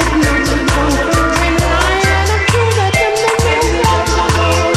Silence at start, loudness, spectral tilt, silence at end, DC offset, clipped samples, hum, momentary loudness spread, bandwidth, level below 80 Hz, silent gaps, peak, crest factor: 0 s; -12 LUFS; -4.5 dB/octave; 0 s; under 0.1%; under 0.1%; none; 1 LU; 15.5 kHz; -20 dBFS; none; 0 dBFS; 12 dB